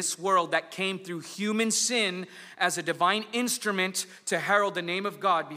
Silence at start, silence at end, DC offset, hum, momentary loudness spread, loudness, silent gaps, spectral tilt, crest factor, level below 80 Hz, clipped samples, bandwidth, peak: 0 s; 0 s; under 0.1%; none; 8 LU; -27 LUFS; none; -2.5 dB/octave; 20 dB; -84 dBFS; under 0.1%; 16 kHz; -10 dBFS